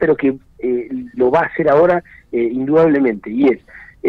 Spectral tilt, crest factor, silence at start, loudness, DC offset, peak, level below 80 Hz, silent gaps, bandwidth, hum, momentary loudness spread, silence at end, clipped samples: -9 dB/octave; 12 dB; 0 s; -16 LUFS; under 0.1%; -4 dBFS; -48 dBFS; none; 5.8 kHz; none; 11 LU; 0 s; under 0.1%